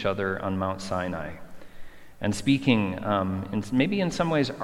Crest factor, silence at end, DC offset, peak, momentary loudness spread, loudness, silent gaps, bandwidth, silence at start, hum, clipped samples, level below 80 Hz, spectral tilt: 20 dB; 0 s; under 0.1%; -6 dBFS; 9 LU; -27 LUFS; none; 13.5 kHz; 0 s; none; under 0.1%; -52 dBFS; -6 dB/octave